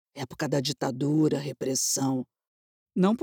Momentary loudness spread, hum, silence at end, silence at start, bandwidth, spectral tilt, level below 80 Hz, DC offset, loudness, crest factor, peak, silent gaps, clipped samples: 10 LU; none; 0 s; 0.15 s; over 20 kHz; -4.5 dB/octave; -70 dBFS; under 0.1%; -27 LUFS; 16 dB; -12 dBFS; 2.47-2.86 s; under 0.1%